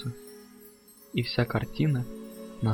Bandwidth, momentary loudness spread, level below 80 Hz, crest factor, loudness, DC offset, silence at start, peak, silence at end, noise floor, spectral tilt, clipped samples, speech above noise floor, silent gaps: 17 kHz; 22 LU; -52 dBFS; 20 dB; -30 LUFS; under 0.1%; 0 s; -12 dBFS; 0 s; -54 dBFS; -7 dB/octave; under 0.1%; 26 dB; none